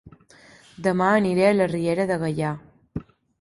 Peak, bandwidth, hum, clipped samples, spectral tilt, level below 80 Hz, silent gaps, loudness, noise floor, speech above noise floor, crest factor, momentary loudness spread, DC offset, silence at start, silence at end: -6 dBFS; 11.5 kHz; none; under 0.1%; -7 dB/octave; -54 dBFS; none; -22 LUFS; -52 dBFS; 31 dB; 18 dB; 18 LU; under 0.1%; 0.05 s; 0.4 s